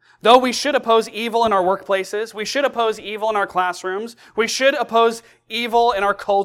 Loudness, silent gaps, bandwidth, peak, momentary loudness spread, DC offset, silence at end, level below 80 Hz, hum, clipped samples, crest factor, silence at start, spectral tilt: -19 LUFS; none; 16 kHz; 0 dBFS; 12 LU; under 0.1%; 0 s; -56 dBFS; none; under 0.1%; 18 dB; 0.25 s; -2.5 dB/octave